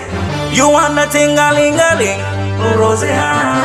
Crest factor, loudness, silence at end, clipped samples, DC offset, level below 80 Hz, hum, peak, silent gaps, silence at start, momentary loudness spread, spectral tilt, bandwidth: 12 dB; -12 LUFS; 0 s; under 0.1%; under 0.1%; -38 dBFS; none; 0 dBFS; none; 0 s; 8 LU; -4 dB/octave; 15 kHz